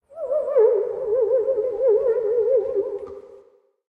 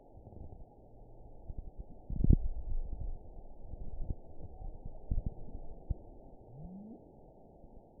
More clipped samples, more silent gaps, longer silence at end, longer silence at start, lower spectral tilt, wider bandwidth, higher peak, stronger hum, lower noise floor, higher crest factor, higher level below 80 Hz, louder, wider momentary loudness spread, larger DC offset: neither; neither; first, 0.5 s vs 0 s; about the same, 0.1 s vs 0 s; second, -8 dB/octave vs -16.5 dB/octave; first, 2.7 kHz vs 1 kHz; about the same, -8 dBFS vs -10 dBFS; neither; about the same, -55 dBFS vs -57 dBFS; second, 14 dB vs 28 dB; second, -62 dBFS vs -40 dBFS; first, -21 LUFS vs -41 LUFS; second, 11 LU vs 22 LU; neither